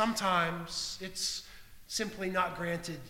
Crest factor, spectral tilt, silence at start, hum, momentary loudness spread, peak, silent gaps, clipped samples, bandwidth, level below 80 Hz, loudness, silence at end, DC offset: 20 dB; -3 dB/octave; 0 s; none; 9 LU; -14 dBFS; none; under 0.1%; 18 kHz; -58 dBFS; -33 LUFS; 0 s; under 0.1%